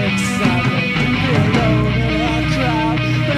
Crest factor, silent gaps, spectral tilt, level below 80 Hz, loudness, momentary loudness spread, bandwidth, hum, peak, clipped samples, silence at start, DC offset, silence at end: 14 dB; none; -6 dB/octave; -30 dBFS; -16 LUFS; 2 LU; 13.5 kHz; none; -2 dBFS; under 0.1%; 0 s; under 0.1%; 0 s